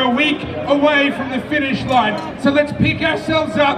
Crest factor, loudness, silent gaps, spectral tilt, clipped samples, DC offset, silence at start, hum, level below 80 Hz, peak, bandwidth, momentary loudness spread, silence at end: 16 dB; -16 LUFS; none; -6 dB/octave; under 0.1%; under 0.1%; 0 s; none; -44 dBFS; -2 dBFS; 10.5 kHz; 6 LU; 0 s